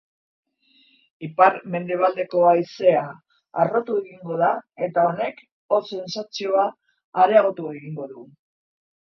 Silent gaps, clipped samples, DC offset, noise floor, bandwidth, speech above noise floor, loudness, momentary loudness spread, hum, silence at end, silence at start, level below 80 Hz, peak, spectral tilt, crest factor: 5.52-5.69 s, 7.04-7.12 s; under 0.1%; under 0.1%; -60 dBFS; 6.8 kHz; 39 dB; -21 LUFS; 15 LU; none; 0.95 s; 1.2 s; -74 dBFS; 0 dBFS; -6 dB/octave; 22 dB